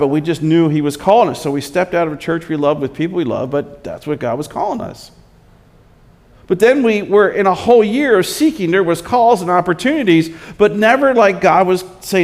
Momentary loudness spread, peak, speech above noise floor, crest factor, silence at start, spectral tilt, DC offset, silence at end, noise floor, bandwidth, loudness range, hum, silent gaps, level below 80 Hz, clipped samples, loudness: 10 LU; 0 dBFS; 33 dB; 14 dB; 0 s; -6 dB/octave; under 0.1%; 0 s; -46 dBFS; 16 kHz; 8 LU; none; none; -48 dBFS; under 0.1%; -14 LUFS